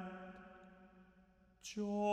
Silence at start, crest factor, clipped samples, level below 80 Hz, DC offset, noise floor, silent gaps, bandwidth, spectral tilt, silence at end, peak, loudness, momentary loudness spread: 0 s; 20 dB; under 0.1%; -74 dBFS; under 0.1%; -69 dBFS; none; 13.5 kHz; -5.5 dB/octave; 0 s; -26 dBFS; -45 LUFS; 24 LU